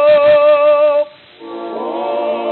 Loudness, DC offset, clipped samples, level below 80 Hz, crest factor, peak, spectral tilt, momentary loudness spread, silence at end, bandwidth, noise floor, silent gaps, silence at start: -12 LUFS; under 0.1%; under 0.1%; -58 dBFS; 10 dB; -2 dBFS; -8 dB/octave; 17 LU; 0 s; 4.4 kHz; -34 dBFS; none; 0 s